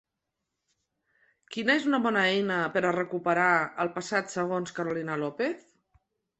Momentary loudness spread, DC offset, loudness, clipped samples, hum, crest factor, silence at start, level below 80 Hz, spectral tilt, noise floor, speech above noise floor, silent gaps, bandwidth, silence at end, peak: 8 LU; under 0.1%; -27 LUFS; under 0.1%; none; 20 dB; 1.5 s; -72 dBFS; -5 dB/octave; -85 dBFS; 57 dB; none; 8.4 kHz; 0.8 s; -10 dBFS